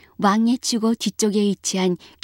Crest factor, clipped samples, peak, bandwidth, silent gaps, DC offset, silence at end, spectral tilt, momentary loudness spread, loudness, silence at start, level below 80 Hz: 16 dB; under 0.1%; -6 dBFS; 16.5 kHz; none; under 0.1%; 0.3 s; -4.5 dB/octave; 4 LU; -21 LUFS; 0.2 s; -64 dBFS